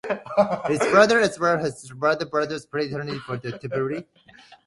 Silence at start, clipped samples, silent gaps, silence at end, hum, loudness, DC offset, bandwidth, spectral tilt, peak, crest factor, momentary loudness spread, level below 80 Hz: 0.05 s; under 0.1%; none; 0.1 s; none; -23 LUFS; under 0.1%; 11.5 kHz; -5 dB/octave; -2 dBFS; 22 dB; 14 LU; -62 dBFS